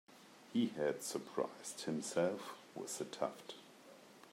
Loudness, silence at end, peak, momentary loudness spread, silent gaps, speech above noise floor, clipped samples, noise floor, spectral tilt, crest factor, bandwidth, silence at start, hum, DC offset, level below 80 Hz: -41 LUFS; 0 s; -22 dBFS; 22 LU; none; 20 dB; under 0.1%; -60 dBFS; -4 dB/octave; 20 dB; 16 kHz; 0.1 s; none; under 0.1%; -90 dBFS